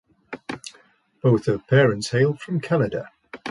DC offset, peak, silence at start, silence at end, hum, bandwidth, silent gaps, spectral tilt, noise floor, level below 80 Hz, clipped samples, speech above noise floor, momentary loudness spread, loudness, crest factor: under 0.1%; -4 dBFS; 0.3 s; 0 s; none; 11.5 kHz; none; -6.5 dB/octave; -57 dBFS; -56 dBFS; under 0.1%; 37 dB; 19 LU; -21 LUFS; 18 dB